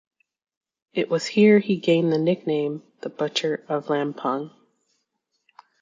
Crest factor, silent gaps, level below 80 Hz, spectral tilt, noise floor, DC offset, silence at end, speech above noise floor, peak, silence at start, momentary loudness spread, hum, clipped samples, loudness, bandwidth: 18 dB; none; -72 dBFS; -6 dB/octave; -76 dBFS; under 0.1%; 1.35 s; 54 dB; -6 dBFS; 0.95 s; 14 LU; none; under 0.1%; -23 LUFS; 7.6 kHz